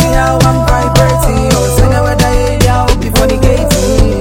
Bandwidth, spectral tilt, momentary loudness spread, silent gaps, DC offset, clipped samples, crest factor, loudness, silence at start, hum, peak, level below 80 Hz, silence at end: 17 kHz; -5.5 dB/octave; 2 LU; none; under 0.1%; 1%; 8 dB; -10 LUFS; 0 s; none; 0 dBFS; -14 dBFS; 0 s